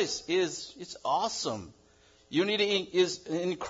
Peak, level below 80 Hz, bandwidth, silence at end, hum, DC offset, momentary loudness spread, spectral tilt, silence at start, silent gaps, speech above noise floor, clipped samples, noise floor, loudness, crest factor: -14 dBFS; -68 dBFS; 7.8 kHz; 0 s; none; under 0.1%; 11 LU; -3.5 dB/octave; 0 s; none; 31 dB; under 0.1%; -62 dBFS; -30 LUFS; 18 dB